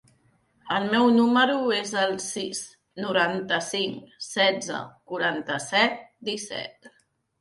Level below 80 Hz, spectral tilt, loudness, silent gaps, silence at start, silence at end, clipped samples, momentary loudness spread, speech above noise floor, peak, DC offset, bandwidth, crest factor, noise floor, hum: -70 dBFS; -3 dB/octave; -25 LUFS; none; 0.65 s; 0.5 s; under 0.1%; 15 LU; 39 dB; -6 dBFS; under 0.1%; 11.5 kHz; 20 dB; -64 dBFS; none